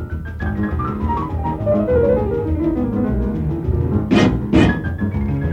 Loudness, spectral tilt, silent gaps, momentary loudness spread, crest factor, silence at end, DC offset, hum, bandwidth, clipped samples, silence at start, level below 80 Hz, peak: -19 LUFS; -8 dB/octave; none; 7 LU; 18 dB; 0 s; under 0.1%; none; 8.6 kHz; under 0.1%; 0 s; -28 dBFS; 0 dBFS